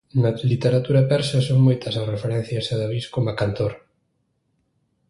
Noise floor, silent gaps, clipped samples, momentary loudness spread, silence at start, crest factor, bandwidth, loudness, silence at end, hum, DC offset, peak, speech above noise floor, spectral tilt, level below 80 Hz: -70 dBFS; none; under 0.1%; 8 LU; 0.15 s; 16 dB; 11.5 kHz; -21 LUFS; 1.3 s; none; under 0.1%; -6 dBFS; 50 dB; -7 dB/octave; -50 dBFS